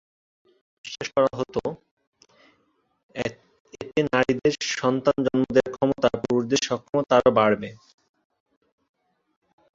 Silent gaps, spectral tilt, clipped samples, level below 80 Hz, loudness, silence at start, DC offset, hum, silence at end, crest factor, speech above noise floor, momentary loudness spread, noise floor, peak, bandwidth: 1.91-1.97 s, 2.07-2.12 s, 3.03-3.09 s, 3.60-3.65 s, 6.89-6.93 s; -5 dB/octave; under 0.1%; -56 dBFS; -23 LUFS; 0.85 s; under 0.1%; none; 2 s; 22 dB; 46 dB; 15 LU; -69 dBFS; -4 dBFS; 7.8 kHz